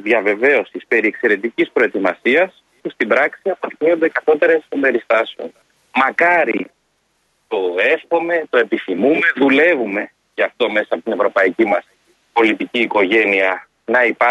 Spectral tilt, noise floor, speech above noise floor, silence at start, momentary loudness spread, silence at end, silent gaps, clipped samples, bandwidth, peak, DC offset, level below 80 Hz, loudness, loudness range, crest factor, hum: -5.5 dB/octave; -64 dBFS; 48 dB; 0.05 s; 9 LU; 0 s; none; under 0.1%; 9.4 kHz; -2 dBFS; under 0.1%; -66 dBFS; -16 LUFS; 2 LU; 16 dB; none